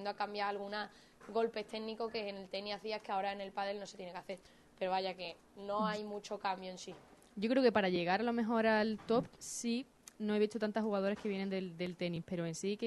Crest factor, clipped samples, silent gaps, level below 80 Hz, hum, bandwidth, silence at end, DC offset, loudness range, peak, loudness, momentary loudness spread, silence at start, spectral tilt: 20 dB; under 0.1%; none; -74 dBFS; none; 12 kHz; 0 s; under 0.1%; 7 LU; -18 dBFS; -38 LUFS; 15 LU; 0 s; -5 dB/octave